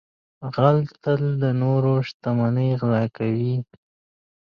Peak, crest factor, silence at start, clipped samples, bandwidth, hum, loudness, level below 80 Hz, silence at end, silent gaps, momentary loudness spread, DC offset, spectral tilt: -4 dBFS; 18 dB; 0.4 s; under 0.1%; 6 kHz; none; -22 LUFS; -60 dBFS; 0.8 s; 2.14-2.20 s; 8 LU; under 0.1%; -10 dB/octave